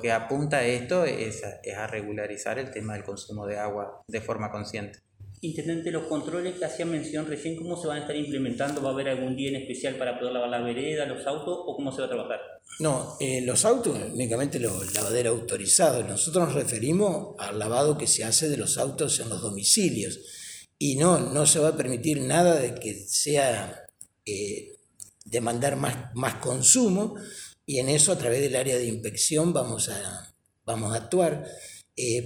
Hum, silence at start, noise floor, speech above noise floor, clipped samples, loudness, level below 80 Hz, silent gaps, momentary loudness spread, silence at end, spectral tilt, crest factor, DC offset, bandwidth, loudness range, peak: none; 0 s; -50 dBFS; 23 dB; under 0.1%; -26 LUFS; -62 dBFS; none; 15 LU; 0 s; -3.5 dB/octave; 24 dB; under 0.1%; over 20 kHz; 9 LU; -4 dBFS